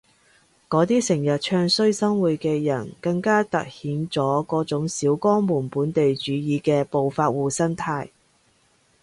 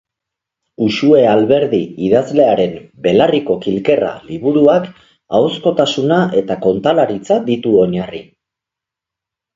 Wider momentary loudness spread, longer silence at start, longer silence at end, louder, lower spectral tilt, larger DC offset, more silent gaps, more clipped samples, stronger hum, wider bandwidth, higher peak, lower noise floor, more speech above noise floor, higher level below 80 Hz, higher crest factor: about the same, 7 LU vs 9 LU; about the same, 0.7 s vs 0.8 s; second, 0.95 s vs 1.35 s; second, -22 LUFS vs -14 LUFS; about the same, -5.5 dB/octave vs -6.5 dB/octave; neither; neither; neither; neither; first, 11.5 kHz vs 7.6 kHz; second, -8 dBFS vs 0 dBFS; second, -62 dBFS vs -84 dBFS; second, 40 dB vs 71 dB; second, -60 dBFS vs -52 dBFS; about the same, 16 dB vs 14 dB